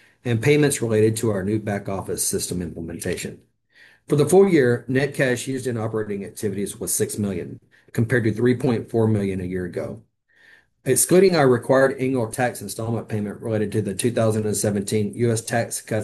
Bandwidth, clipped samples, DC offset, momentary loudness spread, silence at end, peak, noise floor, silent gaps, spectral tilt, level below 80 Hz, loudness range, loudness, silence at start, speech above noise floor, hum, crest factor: 13 kHz; under 0.1%; under 0.1%; 12 LU; 0 s; -4 dBFS; -55 dBFS; none; -5.5 dB/octave; -58 dBFS; 4 LU; -22 LUFS; 0.25 s; 34 dB; none; 16 dB